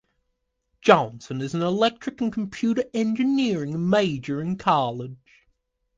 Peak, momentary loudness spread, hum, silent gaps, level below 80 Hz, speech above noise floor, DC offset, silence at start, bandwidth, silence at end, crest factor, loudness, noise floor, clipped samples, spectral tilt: 0 dBFS; 10 LU; none; none; -60 dBFS; 53 dB; under 0.1%; 0.85 s; 8 kHz; 0.8 s; 24 dB; -23 LUFS; -76 dBFS; under 0.1%; -6 dB/octave